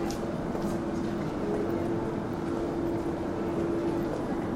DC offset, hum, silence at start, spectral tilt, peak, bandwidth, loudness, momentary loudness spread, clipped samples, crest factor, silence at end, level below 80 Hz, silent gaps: under 0.1%; none; 0 s; -7 dB/octave; -18 dBFS; 15.5 kHz; -31 LUFS; 3 LU; under 0.1%; 14 dB; 0 s; -48 dBFS; none